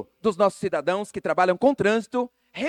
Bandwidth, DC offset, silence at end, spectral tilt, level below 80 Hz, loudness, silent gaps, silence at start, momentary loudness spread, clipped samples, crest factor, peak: 12.5 kHz; under 0.1%; 0 s; -5.5 dB/octave; -62 dBFS; -24 LUFS; none; 0 s; 8 LU; under 0.1%; 16 dB; -8 dBFS